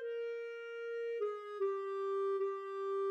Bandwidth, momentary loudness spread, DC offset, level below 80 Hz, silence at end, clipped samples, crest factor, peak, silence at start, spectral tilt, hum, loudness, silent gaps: 7.8 kHz; 7 LU; under 0.1%; under -90 dBFS; 0 s; under 0.1%; 10 dB; -28 dBFS; 0 s; -3 dB/octave; none; -39 LUFS; none